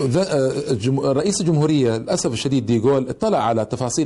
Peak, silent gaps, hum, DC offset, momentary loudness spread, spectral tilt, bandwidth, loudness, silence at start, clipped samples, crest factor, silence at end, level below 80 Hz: -8 dBFS; none; none; under 0.1%; 4 LU; -6 dB/octave; 11.5 kHz; -19 LUFS; 0 s; under 0.1%; 10 dB; 0 s; -50 dBFS